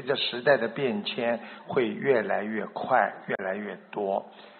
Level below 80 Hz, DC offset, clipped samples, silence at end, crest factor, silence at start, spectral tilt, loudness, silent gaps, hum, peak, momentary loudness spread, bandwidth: -80 dBFS; under 0.1%; under 0.1%; 0.05 s; 20 dB; 0 s; -2.5 dB/octave; -28 LUFS; none; none; -8 dBFS; 9 LU; 4.6 kHz